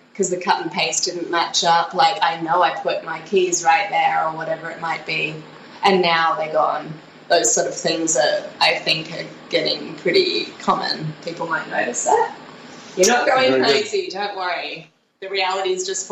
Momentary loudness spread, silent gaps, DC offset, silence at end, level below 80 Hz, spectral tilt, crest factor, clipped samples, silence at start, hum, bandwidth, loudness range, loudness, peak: 11 LU; none; under 0.1%; 0 s; -66 dBFS; -2 dB/octave; 16 dB; under 0.1%; 0.15 s; none; 15.5 kHz; 3 LU; -19 LUFS; -4 dBFS